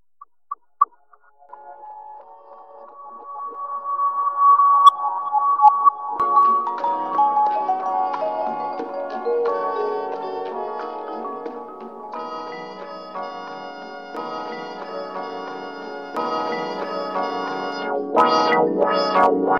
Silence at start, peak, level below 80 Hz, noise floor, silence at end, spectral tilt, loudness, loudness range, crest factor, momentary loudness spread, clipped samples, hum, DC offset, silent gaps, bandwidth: 0.2 s; -2 dBFS; -72 dBFS; -56 dBFS; 0 s; -5 dB/octave; -21 LUFS; 15 LU; 20 dB; 20 LU; under 0.1%; none; 0.2%; none; 10.5 kHz